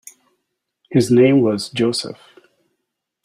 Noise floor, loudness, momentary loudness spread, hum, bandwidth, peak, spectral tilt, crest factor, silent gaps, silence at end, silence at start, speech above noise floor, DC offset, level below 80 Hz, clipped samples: -77 dBFS; -16 LUFS; 10 LU; none; 14 kHz; -2 dBFS; -6 dB/octave; 16 dB; none; 1.1 s; 0.9 s; 61 dB; under 0.1%; -58 dBFS; under 0.1%